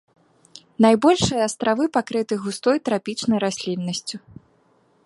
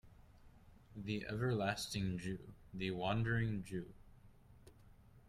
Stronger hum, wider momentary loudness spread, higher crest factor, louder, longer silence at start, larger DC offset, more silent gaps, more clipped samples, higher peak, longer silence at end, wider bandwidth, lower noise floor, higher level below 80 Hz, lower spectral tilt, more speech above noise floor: neither; about the same, 11 LU vs 13 LU; about the same, 20 dB vs 18 dB; first, -21 LUFS vs -41 LUFS; first, 0.8 s vs 0.05 s; neither; neither; neither; first, -2 dBFS vs -24 dBFS; first, 0.9 s vs 0 s; second, 11.5 kHz vs 14 kHz; about the same, -60 dBFS vs -63 dBFS; first, -54 dBFS vs -62 dBFS; second, -4.5 dB/octave vs -6 dB/octave; first, 40 dB vs 23 dB